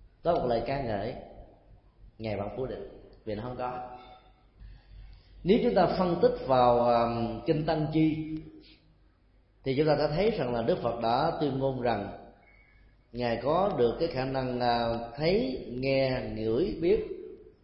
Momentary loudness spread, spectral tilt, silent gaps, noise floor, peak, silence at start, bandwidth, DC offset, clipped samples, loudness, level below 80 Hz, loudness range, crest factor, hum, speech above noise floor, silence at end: 15 LU; -10.5 dB/octave; none; -63 dBFS; -10 dBFS; 0 s; 5.8 kHz; under 0.1%; under 0.1%; -29 LUFS; -50 dBFS; 12 LU; 20 dB; none; 35 dB; 0.15 s